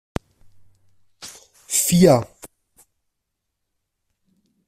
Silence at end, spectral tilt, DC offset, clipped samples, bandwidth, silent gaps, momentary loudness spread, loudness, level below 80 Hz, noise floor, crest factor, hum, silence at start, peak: 2.2 s; -5 dB/octave; under 0.1%; under 0.1%; 16 kHz; none; 25 LU; -17 LUFS; -50 dBFS; -79 dBFS; 22 dB; none; 1.2 s; -2 dBFS